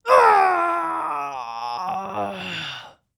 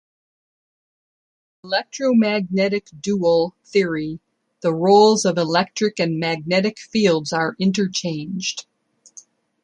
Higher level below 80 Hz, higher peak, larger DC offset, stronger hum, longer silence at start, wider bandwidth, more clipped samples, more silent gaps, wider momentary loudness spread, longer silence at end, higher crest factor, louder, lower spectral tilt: second, -68 dBFS vs -62 dBFS; about the same, -4 dBFS vs -2 dBFS; neither; neither; second, 0.05 s vs 1.65 s; first, over 20 kHz vs 11 kHz; neither; neither; first, 15 LU vs 10 LU; second, 0.3 s vs 1 s; about the same, 18 dB vs 18 dB; about the same, -21 LUFS vs -20 LUFS; about the same, -4 dB/octave vs -5 dB/octave